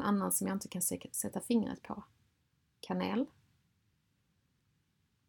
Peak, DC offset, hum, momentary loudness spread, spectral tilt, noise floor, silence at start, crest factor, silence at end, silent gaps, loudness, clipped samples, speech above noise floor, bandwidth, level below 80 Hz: -18 dBFS; under 0.1%; none; 13 LU; -4.5 dB/octave; -77 dBFS; 0 s; 20 dB; 2 s; none; -35 LUFS; under 0.1%; 42 dB; 19 kHz; -72 dBFS